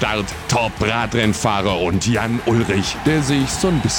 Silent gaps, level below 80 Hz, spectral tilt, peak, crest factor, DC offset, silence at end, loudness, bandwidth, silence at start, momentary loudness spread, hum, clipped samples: none; -36 dBFS; -4.5 dB/octave; -4 dBFS; 14 dB; under 0.1%; 0 s; -18 LUFS; 19 kHz; 0 s; 2 LU; none; under 0.1%